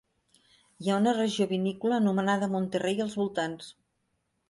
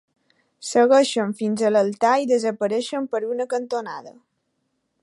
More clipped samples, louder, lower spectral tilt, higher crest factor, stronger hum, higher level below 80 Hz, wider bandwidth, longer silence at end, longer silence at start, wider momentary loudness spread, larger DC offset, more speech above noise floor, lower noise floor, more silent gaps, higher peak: neither; second, -28 LUFS vs -21 LUFS; first, -6 dB/octave vs -4.5 dB/octave; about the same, 14 dB vs 16 dB; neither; about the same, -72 dBFS vs -76 dBFS; about the same, 11.5 kHz vs 11.5 kHz; about the same, 0.8 s vs 0.9 s; first, 0.8 s vs 0.6 s; second, 9 LU vs 12 LU; neither; second, 49 dB vs 53 dB; first, -77 dBFS vs -73 dBFS; neither; second, -14 dBFS vs -6 dBFS